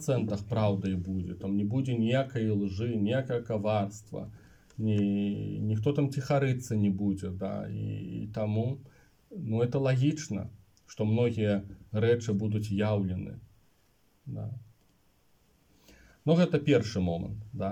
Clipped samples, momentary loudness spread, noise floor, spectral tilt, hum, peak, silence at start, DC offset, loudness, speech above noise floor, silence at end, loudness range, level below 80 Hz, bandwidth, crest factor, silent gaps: under 0.1%; 14 LU; -68 dBFS; -7.5 dB/octave; none; -12 dBFS; 0 s; under 0.1%; -30 LUFS; 39 dB; 0 s; 4 LU; -62 dBFS; 11 kHz; 18 dB; none